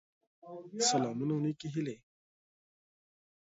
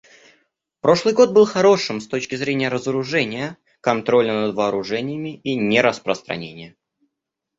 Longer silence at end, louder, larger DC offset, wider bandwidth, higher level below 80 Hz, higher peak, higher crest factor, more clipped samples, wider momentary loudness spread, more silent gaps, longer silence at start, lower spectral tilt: first, 1.55 s vs 0.9 s; second, -33 LUFS vs -19 LUFS; neither; about the same, 7.6 kHz vs 8 kHz; second, -78 dBFS vs -60 dBFS; second, -16 dBFS vs -2 dBFS; about the same, 22 dB vs 18 dB; neither; first, 20 LU vs 13 LU; neither; second, 0.45 s vs 0.85 s; about the same, -5 dB/octave vs -5 dB/octave